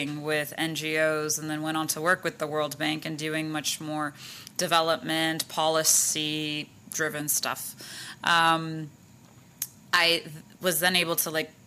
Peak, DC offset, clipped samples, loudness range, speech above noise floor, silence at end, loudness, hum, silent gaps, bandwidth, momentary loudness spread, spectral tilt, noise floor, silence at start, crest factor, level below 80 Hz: -4 dBFS; under 0.1%; under 0.1%; 3 LU; 26 dB; 0.15 s; -26 LUFS; none; none; 15.5 kHz; 14 LU; -2 dB/octave; -53 dBFS; 0 s; 24 dB; -72 dBFS